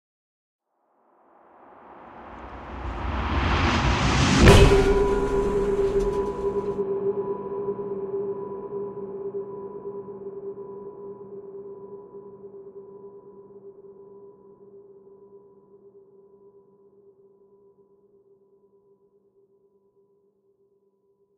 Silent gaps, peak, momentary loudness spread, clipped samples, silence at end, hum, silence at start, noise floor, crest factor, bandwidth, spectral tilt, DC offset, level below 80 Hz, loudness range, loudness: none; -2 dBFS; 25 LU; under 0.1%; 6 s; none; 1.9 s; -67 dBFS; 26 dB; 14.5 kHz; -5.5 dB/octave; under 0.1%; -34 dBFS; 24 LU; -24 LUFS